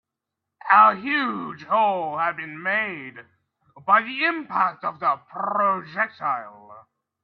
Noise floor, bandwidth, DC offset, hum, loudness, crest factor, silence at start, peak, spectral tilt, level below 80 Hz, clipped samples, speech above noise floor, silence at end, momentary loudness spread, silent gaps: -84 dBFS; 5.8 kHz; under 0.1%; none; -22 LUFS; 22 dB; 0.65 s; -2 dBFS; -7 dB/octave; -76 dBFS; under 0.1%; 62 dB; 0.45 s; 14 LU; none